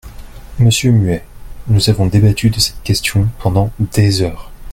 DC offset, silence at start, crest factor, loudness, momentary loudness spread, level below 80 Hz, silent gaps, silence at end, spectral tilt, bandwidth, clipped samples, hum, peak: under 0.1%; 0.05 s; 14 dB; -14 LUFS; 7 LU; -30 dBFS; none; 0 s; -5.5 dB/octave; 16 kHz; under 0.1%; none; 0 dBFS